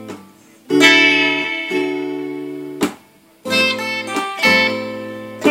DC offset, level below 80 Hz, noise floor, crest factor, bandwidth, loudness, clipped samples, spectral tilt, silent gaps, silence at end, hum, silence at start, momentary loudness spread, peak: under 0.1%; -64 dBFS; -48 dBFS; 18 dB; 16.5 kHz; -15 LUFS; under 0.1%; -3 dB/octave; none; 0 s; none; 0 s; 18 LU; 0 dBFS